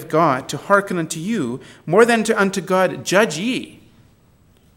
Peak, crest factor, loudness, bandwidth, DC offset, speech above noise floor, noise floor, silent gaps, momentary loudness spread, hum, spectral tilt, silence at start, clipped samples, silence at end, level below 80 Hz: 0 dBFS; 20 dB; -18 LUFS; 16.5 kHz; under 0.1%; 36 dB; -54 dBFS; none; 10 LU; none; -4.5 dB/octave; 0 s; under 0.1%; 1.05 s; -60 dBFS